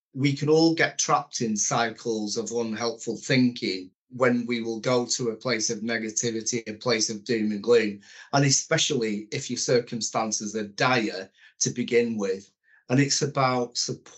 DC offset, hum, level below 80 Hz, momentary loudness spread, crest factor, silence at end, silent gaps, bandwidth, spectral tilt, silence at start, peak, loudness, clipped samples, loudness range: under 0.1%; none; -76 dBFS; 9 LU; 20 dB; 0.1 s; 3.95-4.07 s; 8.2 kHz; -3.5 dB/octave; 0.15 s; -6 dBFS; -25 LUFS; under 0.1%; 2 LU